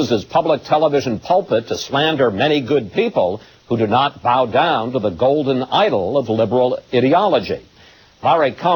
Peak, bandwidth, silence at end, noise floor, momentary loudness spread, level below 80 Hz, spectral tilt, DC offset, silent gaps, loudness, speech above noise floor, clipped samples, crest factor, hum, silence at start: -2 dBFS; 18 kHz; 0 s; -47 dBFS; 5 LU; -54 dBFS; -6 dB/octave; under 0.1%; none; -17 LUFS; 31 dB; under 0.1%; 14 dB; none; 0 s